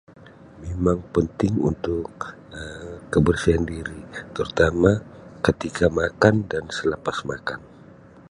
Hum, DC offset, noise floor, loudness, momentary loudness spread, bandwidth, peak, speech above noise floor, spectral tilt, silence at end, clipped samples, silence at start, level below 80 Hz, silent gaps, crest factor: none; under 0.1%; -47 dBFS; -23 LUFS; 17 LU; 11.5 kHz; 0 dBFS; 25 dB; -6.5 dB/octave; 0.1 s; under 0.1%; 0.25 s; -38 dBFS; none; 22 dB